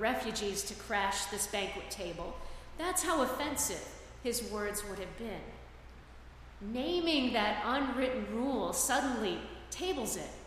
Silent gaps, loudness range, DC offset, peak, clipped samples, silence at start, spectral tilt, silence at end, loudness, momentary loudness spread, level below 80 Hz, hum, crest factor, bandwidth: none; 6 LU; under 0.1%; -18 dBFS; under 0.1%; 0 s; -2.5 dB/octave; 0 s; -34 LUFS; 18 LU; -52 dBFS; none; 18 dB; 15.5 kHz